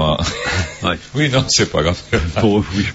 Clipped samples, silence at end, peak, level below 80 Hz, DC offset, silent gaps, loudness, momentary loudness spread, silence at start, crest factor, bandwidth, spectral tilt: under 0.1%; 0 s; 0 dBFS; -32 dBFS; under 0.1%; none; -17 LUFS; 6 LU; 0 s; 16 dB; 8 kHz; -4.5 dB/octave